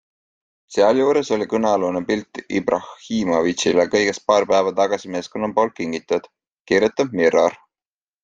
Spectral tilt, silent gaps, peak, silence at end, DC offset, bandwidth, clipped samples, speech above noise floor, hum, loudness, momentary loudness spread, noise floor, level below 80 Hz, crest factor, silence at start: -4.5 dB/octave; 6.52-6.65 s; -2 dBFS; 0.7 s; under 0.1%; 9.2 kHz; under 0.1%; over 71 dB; none; -20 LUFS; 9 LU; under -90 dBFS; -60 dBFS; 18 dB; 0.7 s